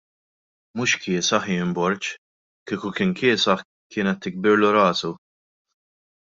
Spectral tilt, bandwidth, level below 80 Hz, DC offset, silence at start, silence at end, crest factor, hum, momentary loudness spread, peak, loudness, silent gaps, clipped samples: -4 dB/octave; 7.8 kHz; -64 dBFS; under 0.1%; 0.75 s; 1.15 s; 20 dB; none; 14 LU; -4 dBFS; -22 LUFS; 2.18-2.66 s, 3.65-3.90 s; under 0.1%